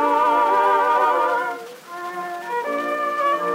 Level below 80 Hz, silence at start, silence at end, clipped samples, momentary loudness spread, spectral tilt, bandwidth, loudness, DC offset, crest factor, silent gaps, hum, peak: -86 dBFS; 0 s; 0 s; under 0.1%; 14 LU; -3.5 dB/octave; 16 kHz; -20 LUFS; under 0.1%; 14 dB; none; none; -6 dBFS